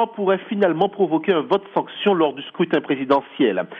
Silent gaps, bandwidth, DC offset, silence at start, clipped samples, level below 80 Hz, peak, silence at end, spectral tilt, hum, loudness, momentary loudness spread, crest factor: none; 5.4 kHz; under 0.1%; 0 s; under 0.1%; -68 dBFS; -6 dBFS; 0 s; -8 dB/octave; none; -20 LUFS; 3 LU; 14 dB